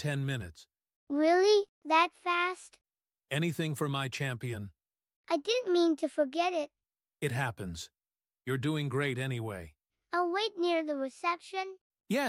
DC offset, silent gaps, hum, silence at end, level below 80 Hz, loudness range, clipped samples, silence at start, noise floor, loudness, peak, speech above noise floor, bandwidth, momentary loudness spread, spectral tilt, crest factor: under 0.1%; 0.96-1.07 s, 1.69-1.82 s, 5.16-5.24 s, 11.81-11.90 s; none; 0 s; -66 dBFS; 5 LU; under 0.1%; 0 s; under -90 dBFS; -32 LUFS; -14 dBFS; over 59 dB; 16 kHz; 14 LU; -5.5 dB/octave; 18 dB